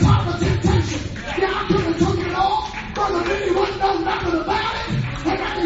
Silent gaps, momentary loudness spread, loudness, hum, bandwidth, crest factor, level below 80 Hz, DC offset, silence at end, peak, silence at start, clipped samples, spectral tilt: none; 5 LU; -21 LUFS; none; 8 kHz; 18 dB; -32 dBFS; under 0.1%; 0 s; -2 dBFS; 0 s; under 0.1%; -6 dB/octave